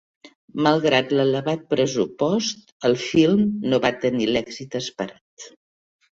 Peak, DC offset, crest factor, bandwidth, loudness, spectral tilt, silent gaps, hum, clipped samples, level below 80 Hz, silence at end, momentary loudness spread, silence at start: -4 dBFS; under 0.1%; 18 dB; 7.8 kHz; -21 LUFS; -5 dB/octave; 0.35-0.48 s, 2.72-2.80 s, 5.21-5.37 s; none; under 0.1%; -58 dBFS; 0.65 s; 14 LU; 0.25 s